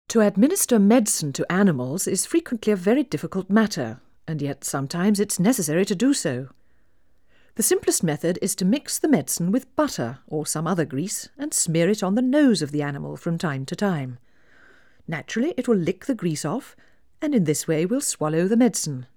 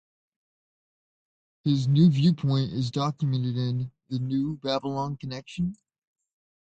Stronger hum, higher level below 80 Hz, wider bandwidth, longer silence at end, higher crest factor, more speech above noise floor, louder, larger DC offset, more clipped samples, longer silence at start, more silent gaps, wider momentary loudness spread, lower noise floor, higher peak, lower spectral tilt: neither; about the same, -62 dBFS vs -60 dBFS; first, over 20 kHz vs 8.4 kHz; second, 0.1 s vs 1 s; about the same, 18 dB vs 18 dB; second, 43 dB vs over 65 dB; first, -23 LUFS vs -26 LUFS; first, 0.2% vs under 0.1%; neither; second, 0.1 s vs 1.65 s; neither; about the same, 11 LU vs 12 LU; second, -65 dBFS vs under -90 dBFS; first, -4 dBFS vs -10 dBFS; second, -5 dB/octave vs -8 dB/octave